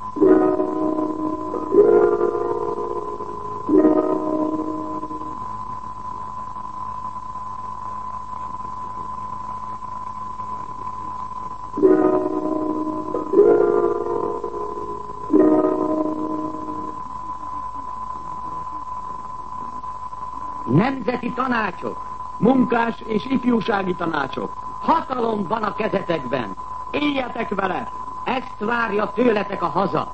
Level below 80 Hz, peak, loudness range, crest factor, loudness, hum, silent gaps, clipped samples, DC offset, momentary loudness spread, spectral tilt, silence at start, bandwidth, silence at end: -48 dBFS; -2 dBFS; 11 LU; 18 dB; -23 LUFS; none; none; under 0.1%; 1%; 15 LU; -7.5 dB/octave; 0 s; 8.6 kHz; 0 s